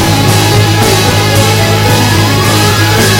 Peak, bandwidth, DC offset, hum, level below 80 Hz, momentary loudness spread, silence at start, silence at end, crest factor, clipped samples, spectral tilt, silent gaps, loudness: 0 dBFS; 17 kHz; under 0.1%; none; -26 dBFS; 1 LU; 0 s; 0 s; 8 dB; 0.4%; -4 dB/octave; none; -7 LUFS